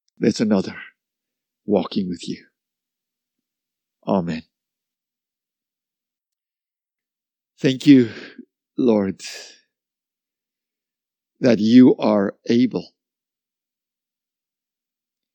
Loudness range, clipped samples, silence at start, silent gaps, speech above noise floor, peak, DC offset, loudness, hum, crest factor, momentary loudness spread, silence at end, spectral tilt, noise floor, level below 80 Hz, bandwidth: 12 LU; under 0.1%; 0.2 s; none; over 72 dB; 0 dBFS; under 0.1%; -18 LUFS; none; 22 dB; 20 LU; 2.5 s; -6.5 dB/octave; under -90 dBFS; -68 dBFS; 8.8 kHz